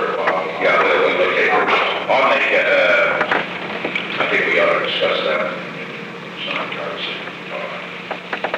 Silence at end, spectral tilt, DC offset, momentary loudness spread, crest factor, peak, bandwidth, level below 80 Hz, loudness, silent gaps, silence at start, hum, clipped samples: 0 s; -4.5 dB/octave; under 0.1%; 13 LU; 16 dB; -2 dBFS; 9.8 kHz; -64 dBFS; -17 LUFS; none; 0 s; none; under 0.1%